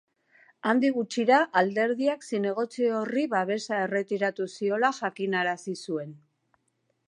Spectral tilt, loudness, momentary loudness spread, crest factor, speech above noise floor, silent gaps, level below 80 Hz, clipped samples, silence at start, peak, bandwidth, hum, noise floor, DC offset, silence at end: -5 dB/octave; -27 LUFS; 10 LU; 20 dB; 48 dB; none; -84 dBFS; under 0.1%; 0.65 s; -8 dBFS; 11.5 kHz; none; -75 dBFS; under 0.1%; 0.9 s